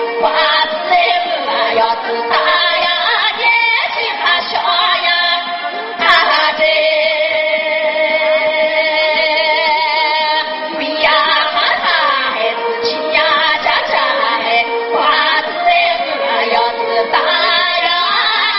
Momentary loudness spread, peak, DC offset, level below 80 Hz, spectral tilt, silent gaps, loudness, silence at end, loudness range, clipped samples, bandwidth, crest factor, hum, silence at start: 5 LU; 0 dBFS; under 0.1%; -54 dBFS; 3 dB/octave; none; -12 LUFS; 0 s; 1 LU; under 0.1%; 6.2 kHz; 14 dB; none; 0 s